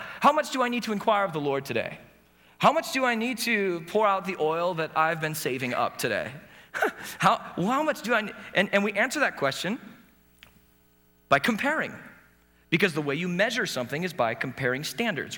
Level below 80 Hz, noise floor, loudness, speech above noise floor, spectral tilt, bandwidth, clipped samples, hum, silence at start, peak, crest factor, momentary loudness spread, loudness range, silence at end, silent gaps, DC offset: -66 dBFS; -62 dBFS; -26 LUFS; 35 dB; -4.5 dB/octave; over 20 kHz; under 0.1%; none; 0 s; -6 dBFS; 20 dB; 8 LU; 3 LU; 0 s; none; under 0.1%